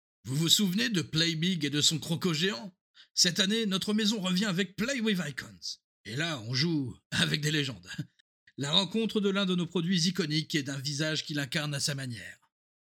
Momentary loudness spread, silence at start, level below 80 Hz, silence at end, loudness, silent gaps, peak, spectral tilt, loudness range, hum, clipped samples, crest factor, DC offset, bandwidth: 14 LU; 0.25 s; -68 dBFS; 0.55 s; -29 LUFS; 2.81-2.94 s, 3.11-3.15 s, 5.84-6.04 s, 7.05-7.10 s, 8.21-8.47 s; -8 dBFS; -3.5 dB/octave; 4 LU; none; under 0.1%; 22 dB; under 0.1%; 18 kHz